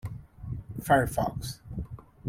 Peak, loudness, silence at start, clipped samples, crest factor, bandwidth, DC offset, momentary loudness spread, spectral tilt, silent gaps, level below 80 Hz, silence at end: -10 dBFS; -30 LUFS; 0.05 s; under 0.1%; 22 dB; 16.5 kHz; under 0.1%; 18 LU; -6 dB/octave; none; -46 dBFS; 0 s